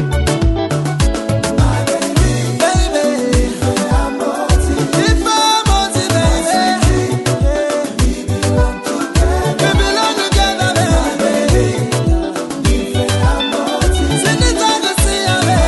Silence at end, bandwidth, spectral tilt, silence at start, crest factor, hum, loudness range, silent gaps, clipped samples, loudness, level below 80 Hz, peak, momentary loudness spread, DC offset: 0 s; 12 kHz; -4.5 dB/octave; 0 s; 12 dB; none; 2 LU; none; under 0.1%; -14 LUFS; -20 dBFS; -2 dBFS; 4 LU; under 0.1%